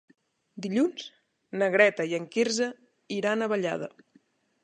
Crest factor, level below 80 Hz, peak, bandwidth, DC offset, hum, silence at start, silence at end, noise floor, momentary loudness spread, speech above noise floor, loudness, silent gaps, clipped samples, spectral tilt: 24 dB; -80 dBFS; -6 dBFS; 10.5 kHz; under 0.1%; none; 0.55 s; 0.75 s; -65 dBFS; 17 LU; 38 dB; -27 LUFS; none; under 0.1%; -4 dB/octave